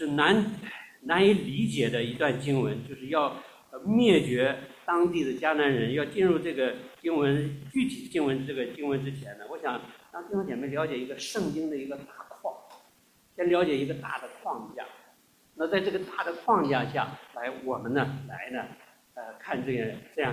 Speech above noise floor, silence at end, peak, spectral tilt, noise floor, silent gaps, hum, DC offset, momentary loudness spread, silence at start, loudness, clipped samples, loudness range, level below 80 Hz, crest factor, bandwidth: 35 dB; 0 s; -8 dBFS; -6 dB/octave; -63 dBFS; none; none; under 0.1%; 17 LU; 0 s; -29 LUFS; under 0.1%; 7 LU; -64 dBFS; 22 dB; 16 kHz